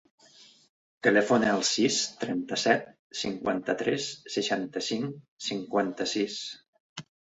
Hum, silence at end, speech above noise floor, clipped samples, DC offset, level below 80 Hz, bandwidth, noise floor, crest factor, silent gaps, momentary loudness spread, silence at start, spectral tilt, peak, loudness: none; 0.4 s; 28 dB; under 0.1%; under 0.1%; -68 dBFS; 8.4 kHz; -57 dBFS; 22 dB; 0.69-1.01 s, 2.99-3.10 s, 5.28-5.37 s, 6.68-6.73 s, 6.80-6.96 s; 15 LU; 0.4 s; -3 dB/octave; -6 dBFS; -28 LUFS